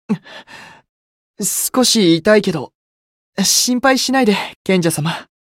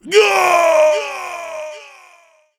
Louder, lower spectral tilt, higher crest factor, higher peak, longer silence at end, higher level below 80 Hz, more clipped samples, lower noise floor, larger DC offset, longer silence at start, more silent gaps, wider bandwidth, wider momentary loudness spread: about the same, -15 LUFS vs -13 LUFS; first, -3.5 dB/octave vs -1 dB/octave; about the same, 16 dB vs 16 dB; about the same, 0 dBFS vs 0 dBFS; second, 0.2 s vs 0.75 s; first, -56 dBFS vs -66 dBFS; neither; first, under -90 dBFS vs -51 dBFS; neither; about the same, 0.1 s vs 0.05 s; first, 0.89-1.34 s, 2.75-3.33 s, 4.56-4.65 s vs none; about the same, 17 kHz vs 18 kHz; second, 14 LU vs 18 LU